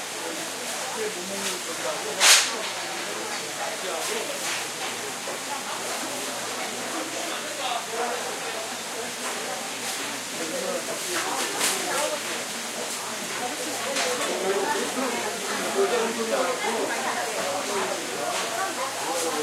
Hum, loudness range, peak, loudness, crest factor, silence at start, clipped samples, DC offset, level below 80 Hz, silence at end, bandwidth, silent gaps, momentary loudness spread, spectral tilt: none; 6 LU; -2 dBFS; -26 LUFS; 26 dB; 0 s; under 0.1%; under 0.1%; -78 dBFS; 0 s; 16 kHz; none; 6 LU; -0.5 dB/octave